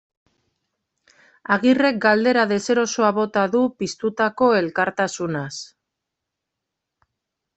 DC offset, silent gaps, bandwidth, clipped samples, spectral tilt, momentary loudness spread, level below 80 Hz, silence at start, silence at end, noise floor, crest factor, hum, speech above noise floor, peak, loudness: under 0.1%; none; 8.4 kHz; under 0.1%; -4.5 dB/octave; 10 LU; -64 dBFS; 1.5 s; 1.9 s; -82 dBFS; 20 dB; none; 63 dB; -2 dBFS; -20 LUFS